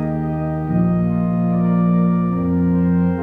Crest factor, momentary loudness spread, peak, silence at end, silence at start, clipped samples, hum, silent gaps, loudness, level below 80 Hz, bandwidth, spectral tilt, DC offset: 10 dB; 6 LU; -8 dBFS; 0 s; 0 s; under 0.1%; none; none; -18 LUFS; -40 dBFS; 2.7 kHz; -12 dB/octave; under 0.1%